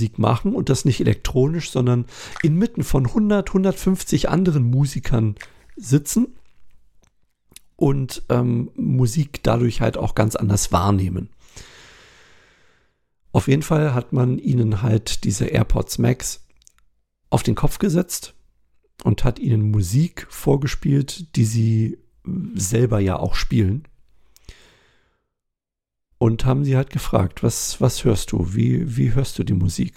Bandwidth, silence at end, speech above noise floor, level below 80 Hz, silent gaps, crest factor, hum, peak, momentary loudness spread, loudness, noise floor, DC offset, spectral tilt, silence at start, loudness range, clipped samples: 16 kHz; 0.05 s; 64 dB; -34 dBFS; none; 18 dB; none; -2 dBFS; 7 LU; -20 LUFS; -83 dBFS; under 0.1%; -6.5 dB/octave; 0 s; 4 LU; under 0.1%